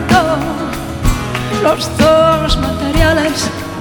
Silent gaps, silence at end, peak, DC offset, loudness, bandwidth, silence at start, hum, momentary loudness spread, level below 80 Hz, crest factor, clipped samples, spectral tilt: none; 0 s; 0 dBFS; under 0.1%; -14 LUFS; 19.5 kHz; 0 s; none; 9 LU; -22 dBFS; 14 dB; under 0.1%; -5 dB/octave